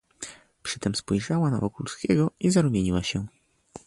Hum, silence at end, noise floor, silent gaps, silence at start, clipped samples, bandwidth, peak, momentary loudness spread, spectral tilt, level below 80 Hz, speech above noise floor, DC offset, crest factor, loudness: none; 0.1 s; -49 dBFS; none; 0.2 s; under 0.1%; 11.5 kHz; -10 dBFS; 17 LU; -5.5 dB/octave; -48 dBFS; 24 dB; under 0.1%; 18 dB; -26 LUFS